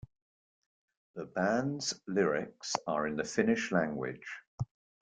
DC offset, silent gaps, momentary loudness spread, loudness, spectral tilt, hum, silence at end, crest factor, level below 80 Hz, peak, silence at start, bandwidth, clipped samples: under 0.1%; 4.47-4.58 s; 13 LU; -33 LUFS; -4.5 dB/octave; none; 0.5 s; 22 dB; -66 dBFS; -12 dBFS; 1.15 s; 9.4 kHz; under 0.1%